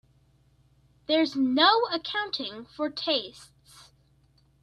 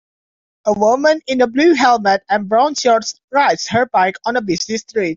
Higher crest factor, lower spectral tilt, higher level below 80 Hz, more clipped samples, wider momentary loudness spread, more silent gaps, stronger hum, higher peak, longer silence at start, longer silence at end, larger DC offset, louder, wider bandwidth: first, 22 dB vs 14 dB; about the same, -3.5 dB/octave vs -3.5 dB/octave; second, -68 dBFS vs -56 dBFS; neither; first, 15 LU vs 7 LU; second, none vs 3.24-3.28 s; first, 60 Hz at -65 dBFS vs none; second, -8 dBFS vs 0 dBFS; first, 1.1 s vs 0.65 s; first, 0.8 s vs 0 s; neither; second, -26 LUFS vs -15 LUFS; first, 12 kHz vs 7.6 kHz